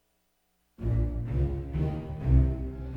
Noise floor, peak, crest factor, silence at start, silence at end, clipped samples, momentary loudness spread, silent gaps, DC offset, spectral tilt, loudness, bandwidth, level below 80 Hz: -73 dBFS; -10 dBFS; 18 dB; 0.8 s; 0 s; under 0.1%; 8 LU; none; under 0.1%; -10.5 dB/octave; -30 LUFS; 3.5 kHz; -32 dBFS